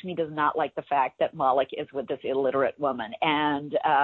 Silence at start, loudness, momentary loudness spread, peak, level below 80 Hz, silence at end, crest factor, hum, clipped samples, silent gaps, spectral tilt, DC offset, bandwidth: 0.05 s; -27 LUFS; 7 LU; -10 dBFS; -66 dBFS; 0 s; 16 dB; none; under 0.1%; none; -8 dB/octave; under 0.1%; 4.3 kHz